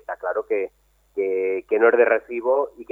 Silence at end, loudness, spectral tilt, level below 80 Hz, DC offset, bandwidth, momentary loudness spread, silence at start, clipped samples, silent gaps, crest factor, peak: 0.1 s; -21 LUFS; -6.5 dB/octave; -64 dBFS; under 0.1%; 3.2 kHz; 11 LU; 0.1 s; under 0.1%; none; 18 dB; -4 dBFS